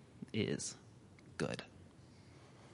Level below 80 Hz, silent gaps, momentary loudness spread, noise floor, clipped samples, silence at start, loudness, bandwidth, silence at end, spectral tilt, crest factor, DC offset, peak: -72 dBFS; none; 21 LU; -60 dBFS; under 0.1%; 0 s; -42 LUFS; 11.5 kHz; 0 s; -4.5 dB/octave; 22 dB; under 0.1%; -24 dBFS